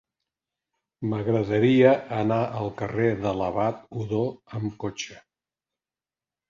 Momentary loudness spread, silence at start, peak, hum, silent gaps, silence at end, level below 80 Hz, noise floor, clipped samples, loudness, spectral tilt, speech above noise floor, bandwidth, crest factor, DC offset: 14 LU; 1 s; -6 dBFS; none; none; 1.3 s; -56 dBFS; under -90 dBFS; under 0.1%; -25 LUFS; -7 dB/octave; over 66 dB; 7.4 kHz; 20 dB; under 0.1%